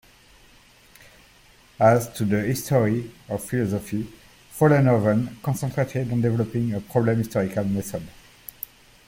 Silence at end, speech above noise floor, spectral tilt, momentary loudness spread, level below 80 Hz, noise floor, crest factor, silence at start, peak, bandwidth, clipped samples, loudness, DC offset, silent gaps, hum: 0.95 s; 31 dB; -7 dB/octave; 18 LU; -52 dBFS; -54 dBFS; 20 dB; 1.8 s; -4 dBFS; 17 kHz; under 0.1%; -23 LUFS; under 0.1%; none; none